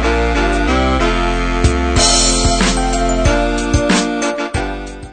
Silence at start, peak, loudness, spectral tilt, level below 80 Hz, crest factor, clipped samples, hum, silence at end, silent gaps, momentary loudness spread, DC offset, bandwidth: 0 s; 0 dBFS; -14 LUFS; -3.5 dB/octave; -20 dBFS; 14 dB; under 0.1%; none; 0 s; none; 8 LU; under 0.1%; 9.4 kHz